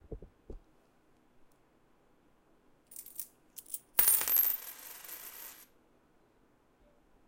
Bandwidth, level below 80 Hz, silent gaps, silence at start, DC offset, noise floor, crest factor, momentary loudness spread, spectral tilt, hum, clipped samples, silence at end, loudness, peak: 17 kHz; -62 dBFS; none; 0.1 s; under 0.1%; -68 dBFS; 30 dB; 27 LU; 0 dB/octave; none; under 0.1%; 1.75 s; -29 LUFS; -8 dBFS